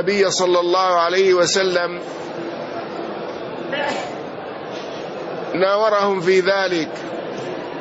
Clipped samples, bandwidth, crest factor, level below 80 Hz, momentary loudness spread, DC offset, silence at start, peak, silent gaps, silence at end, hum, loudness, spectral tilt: under 0.1%; 8 kHz; 14 dB; -64 dBFS; 13 LU; under 0.1%; 0 s; -6 dBFS; none; 0 s; none; -20 LUFS; -3.5 dB/octave